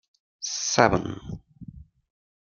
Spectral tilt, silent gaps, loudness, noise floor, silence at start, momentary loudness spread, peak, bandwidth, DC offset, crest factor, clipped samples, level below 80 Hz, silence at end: -3.5 dB/octave; none; -24 LUFS; -45 dBFS; 0.4 s; 25 LU; 0 dBFS; 11 kHz; under 0.1%; 28 dB; under 0.1%; -50 dBFS; 0.6 s